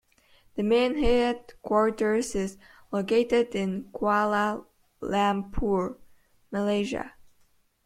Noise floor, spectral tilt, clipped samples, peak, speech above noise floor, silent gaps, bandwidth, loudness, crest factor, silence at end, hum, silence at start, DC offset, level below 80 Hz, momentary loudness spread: -64 dBFS; -5.5 dB/octave; under 0.1%; -10 dBFS; 38 dB; none; 14 kHz; -27 LUFS; 16 dB; 0.75 s; none; 0.55 s; under 0.1%; -44 dBFS; 12 LU